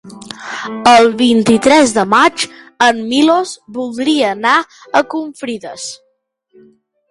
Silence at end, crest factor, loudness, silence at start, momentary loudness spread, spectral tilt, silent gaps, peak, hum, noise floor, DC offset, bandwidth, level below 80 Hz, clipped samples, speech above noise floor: 1.15 s; 14 dB; -12 LUFS; 0.05 s; 15 LU; -3.5 dB/octave; none; 0 dBFS; none; -62 dBFS; under 0.1%; 11.5 kHz; -52 dBFS; under 0.1%; 50 dB